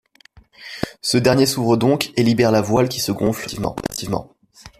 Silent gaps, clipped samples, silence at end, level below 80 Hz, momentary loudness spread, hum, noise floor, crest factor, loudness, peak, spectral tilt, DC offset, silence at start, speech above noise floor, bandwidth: none; under 0.1%; 0.1 s; -48 dBFS; 12 LU; none; -51 dBFS; 16 dB; -19 LUFS; -2 dBFS; -5 dB/octave; under 0.1%; 0.6 s; 33 dB; 15.5 kHz